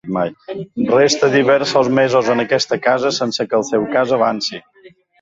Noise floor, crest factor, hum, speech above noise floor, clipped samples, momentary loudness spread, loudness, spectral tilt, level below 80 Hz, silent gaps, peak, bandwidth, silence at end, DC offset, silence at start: -47 dBFS; 14 dB; none; 31 dB; under 0.1%; 10 LU; -16 LUFS; -4 dB/octave; -58 dBFS; none; -2 dBFS; 7.8 kHz; 0.35 s; under 0.1%; 0.05 s